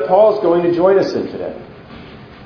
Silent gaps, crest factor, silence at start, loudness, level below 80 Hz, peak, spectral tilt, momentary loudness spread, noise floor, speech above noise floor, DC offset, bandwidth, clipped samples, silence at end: none; 16 dB; 0 s; -14 LUFS; -50 dBFS; 0 dBFS; -7.5 dB/octave; 24 LU; -36 dBFS; 22 dB; under 0.1%; 5.4 kHz; under 0.1%; 0 s